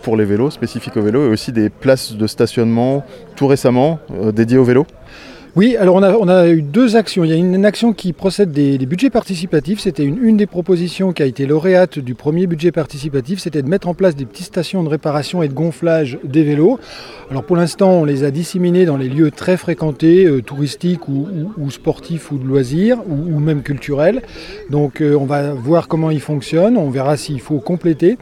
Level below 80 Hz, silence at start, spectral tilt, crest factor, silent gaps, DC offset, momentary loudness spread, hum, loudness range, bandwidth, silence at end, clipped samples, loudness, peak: -46 dBFS; 0.05 s; -7 dB/octave; 14 dB; none; under 0.1%; 9 LU; none; 5 LU; 14.5 kHz; 0.05 s; under 0.1%; -15 LUFS; 0 dBFS